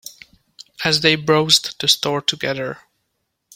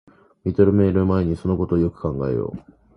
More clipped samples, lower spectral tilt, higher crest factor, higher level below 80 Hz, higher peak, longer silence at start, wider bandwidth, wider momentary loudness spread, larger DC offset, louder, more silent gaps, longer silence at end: neither; second, -3 dB/octave vs -11 dB/octave; about the same, 20 dB vs 18 dB; second, -58 dBFS vs -36 dBFS; about the same, 0 dBFS vs -2 dBFS; second, 0.05 s vs 0.45 s; first, 17 kHz vs 5.4 kHz; first, 15 LU vs 12 LU; neither; first, -17 LUFS vs -21 LUFS; neither; first, 0.8 s vs 0.35 s